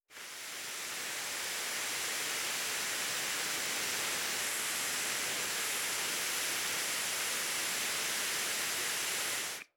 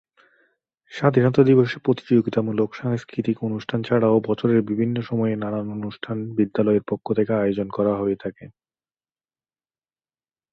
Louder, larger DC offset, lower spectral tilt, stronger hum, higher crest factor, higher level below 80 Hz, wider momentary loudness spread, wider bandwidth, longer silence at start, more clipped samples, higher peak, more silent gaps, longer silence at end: second, -33 LUFS vs -22 LUFS; neither; second, 1 dB/octave vs -9 dB/octave; neither; about the same, 16 dB vs 20 dB; second, -76 dBFS vs -60 dBFS; second, 4 LU vs 10 LU; first, over 20 kHz vs 7 kHz; second, 0.1 s vs 0.9 s; neither; second, -22 dBFS vs -2 dBFS; neither; second, 0.1 s vs 2.05 s